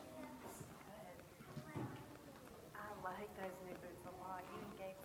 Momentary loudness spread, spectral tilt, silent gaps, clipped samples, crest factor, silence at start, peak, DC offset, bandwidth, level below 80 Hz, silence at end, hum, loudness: 8 LU; -5.5 dB/octave; none; under 0.1%; 20 dB; 0 s; -34 dBFS; under 0.1%; 17 kHz; -72 dBFS; 0 s; none; -53 LUFS